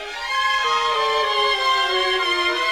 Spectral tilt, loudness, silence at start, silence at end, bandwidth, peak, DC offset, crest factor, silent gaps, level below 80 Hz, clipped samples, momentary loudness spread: -0.5 dB/octave; -19 LUFS; 0 s; 0 s; 17.5 kHz; -8 dBFS; 0.2%; 12 dB; none; -52 dBFS; under 0.1%; 2 LU